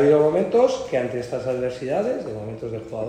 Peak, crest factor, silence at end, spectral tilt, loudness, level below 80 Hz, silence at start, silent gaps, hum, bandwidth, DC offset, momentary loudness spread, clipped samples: -6 dBFS; 16 dB; 0 s; -6.5 dB/octave; -23 LUFS; -54 dBFS; 0 s; none; none; 9.6 kHz; under 0.1%; 13 LU; under 0.1%